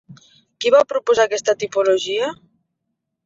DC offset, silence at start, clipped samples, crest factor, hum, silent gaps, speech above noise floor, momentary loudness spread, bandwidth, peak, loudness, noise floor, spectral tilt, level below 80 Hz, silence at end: under 0.1%; 0.1 s; under 0.1%; 18 dB; none; none; 60 dB; 8 LU; 7.8 kHz; -2 dBFS; -18 LUFS; -77 dBFS; -2.5 dB/octave; -64 dBFS; 0.9 s